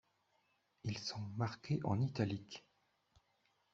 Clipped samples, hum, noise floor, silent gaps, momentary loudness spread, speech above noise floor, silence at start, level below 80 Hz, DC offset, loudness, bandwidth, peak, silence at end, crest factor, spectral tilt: under 0.1%; none; -79 dBFS; none; 11 LU; 39 dB; 0.85 s; -74 dBFS; under 0.1%; -41 LUFS; 7.8 kHz; -22 dBFS; 1.15 s; 22 dB; -6 dB/octave